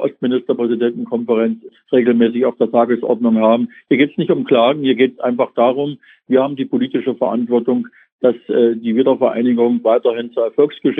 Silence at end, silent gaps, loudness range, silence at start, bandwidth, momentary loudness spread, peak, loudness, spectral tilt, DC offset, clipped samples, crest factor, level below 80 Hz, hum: 0 s; 8.12-8.19 s; 3 LU; 0 s; 3.9 kHz; 6 LU; 0 dBFS; -16 LUFS; -9.5 dB/octave; under 0.1%; under 0.1%; 14 dB; -70 dBFS; none